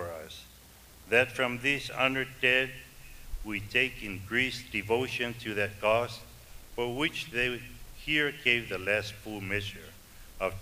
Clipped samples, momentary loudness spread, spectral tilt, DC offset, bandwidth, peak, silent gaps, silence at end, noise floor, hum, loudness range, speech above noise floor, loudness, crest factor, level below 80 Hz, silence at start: under 0.1%; 18 LU; -4 dB/octave; under 0.1%; 15.5 kHz; -8 dBFS; none; 0 s; -54 dBFS; none; 2 LU; 23 dB; -29 LUFS; 24 dB; -50 dBFS; 0 s